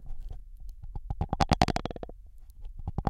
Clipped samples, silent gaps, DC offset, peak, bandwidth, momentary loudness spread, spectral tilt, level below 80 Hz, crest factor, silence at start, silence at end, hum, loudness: under 0.1%; none; under 0.1%; -4 dBFS; 14.5 kHz; 23 LU; -5.5 dB/octave; -38 dBFS; 28 dB; 0 s; 0 s; none; -31 LUFS